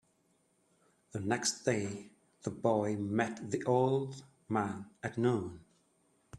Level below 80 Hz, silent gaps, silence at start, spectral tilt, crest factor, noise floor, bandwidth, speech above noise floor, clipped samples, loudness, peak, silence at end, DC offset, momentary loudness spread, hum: -72 dBFS; none; 1.15 s; -5 dB/octave; 20 dB; -74 dBFS; 12.5 kHz; 40 dB; under 0.1%; -34 LUFS; -16 dBFS; 0 s; under 0.1%; 13 LU; none